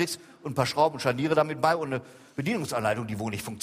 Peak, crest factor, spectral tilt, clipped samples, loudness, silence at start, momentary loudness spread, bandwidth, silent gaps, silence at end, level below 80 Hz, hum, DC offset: -8 dBFS; 20 dB; -5 dB/octave; under 0.1%; -28 LUFS; 0 s; 9 LU; 15.5 kHz; none; 0 s; -62 dBFS; none; under 0.1%